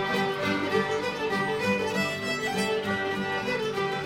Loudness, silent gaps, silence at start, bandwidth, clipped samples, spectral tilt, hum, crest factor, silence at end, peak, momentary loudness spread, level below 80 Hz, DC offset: -27 LUFS; none; 0 s; 16 kHz; under 0.1%; -4.5 dB/octave; none; 14 dB; 0 s; -14 dBFS; 2 LU; -60 dBFS; under 0.1%